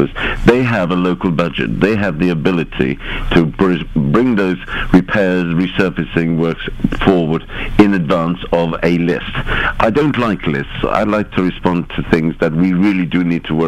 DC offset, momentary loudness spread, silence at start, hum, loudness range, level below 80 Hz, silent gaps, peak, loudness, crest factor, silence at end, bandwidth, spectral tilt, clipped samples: under 0.1%; 6 LU; 0 s; none; 1 LU; -28 dBFS; none; 0 dBFS; -15 LUFS; 14 dB; 0 s; 11 kHz; -7.5 dB/octave; 0.1%